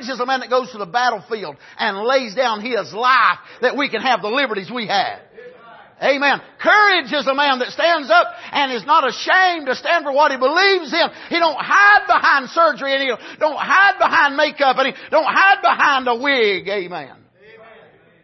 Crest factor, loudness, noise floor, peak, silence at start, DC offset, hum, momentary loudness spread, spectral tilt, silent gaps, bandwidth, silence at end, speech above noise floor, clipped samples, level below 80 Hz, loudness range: 16 dB; -16 LUFS; -48 dBFS; -2 dBFS; 0 s; under 0.1%; none; 10 LU; -3 dB/octave; none; 6.2 kHz; 1.15 s; 31 dB; under 0.1%; -68 dBFS; 4 LU